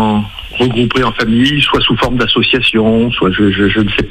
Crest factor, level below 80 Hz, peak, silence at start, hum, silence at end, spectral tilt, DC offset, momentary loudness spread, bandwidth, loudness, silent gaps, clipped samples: 12 dB; -30 dBFS; 0 dBFS; 0 s; none; 0 s; -6 dB/octave; under 0.1%; 5 LU; 13 kHz; -11 LUFS; none; under 0.1%